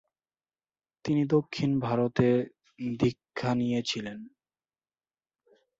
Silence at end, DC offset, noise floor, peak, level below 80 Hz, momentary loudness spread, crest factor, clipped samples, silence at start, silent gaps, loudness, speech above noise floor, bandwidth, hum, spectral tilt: 1.5 s; under 0.1%; under -90 dBFS; -10 dBFS; -62 dBFS; 13 LU; 20 dB; under 0.1%; 1.05 s; none; -29 LUFS; over 62 dB; 7.8 kHz; none; -6.5 dB/octave